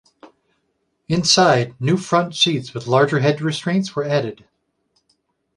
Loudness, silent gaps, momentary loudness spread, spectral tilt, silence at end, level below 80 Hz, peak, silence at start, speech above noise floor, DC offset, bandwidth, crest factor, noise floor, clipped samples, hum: -18 LUFS; none; 9 LU; -4.5 dB/octave; 1.2 s; -58 dBFS; 0 dBFS; 0.25 s; 52 dB; under 0.1%; 11.5 kHz; 20 dB; -70 dBFS; under 0.1%; none